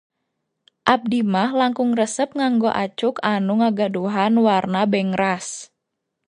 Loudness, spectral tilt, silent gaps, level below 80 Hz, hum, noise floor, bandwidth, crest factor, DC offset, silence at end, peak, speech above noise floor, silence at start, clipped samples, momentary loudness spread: -20 LUFS; -5 dB/octave; none; -64 dBFS; none; -78 dBFS; 10.5 kHz; 20 dB; under 0.1%; 0.65 s; 0 dBFS; 59 dB; 0.85 s; under 0.1%; 5 LU